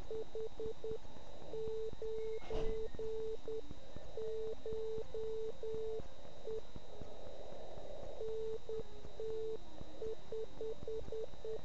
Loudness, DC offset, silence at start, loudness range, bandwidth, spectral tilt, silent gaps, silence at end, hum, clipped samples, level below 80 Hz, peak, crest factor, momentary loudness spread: -46 LUFS; 1%; 0 s; 3 LU; 8 kHz; -6 dB/octave; none; 0 s; none; under 0.1%; -56 dBFS; -24 dBFS; 18 dB; 9 LU